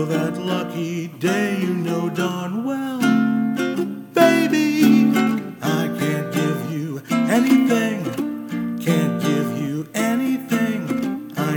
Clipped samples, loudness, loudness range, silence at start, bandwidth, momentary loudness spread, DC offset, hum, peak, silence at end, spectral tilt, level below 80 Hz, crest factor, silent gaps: under 0.1%; -20 LUFS; 4 LU; 0 s; 19.5 kHz; 10 LU; under 0.1%; none; 0 dBFS; 0 s; -6 dB/octave; -66 dBFS; 20 dB; none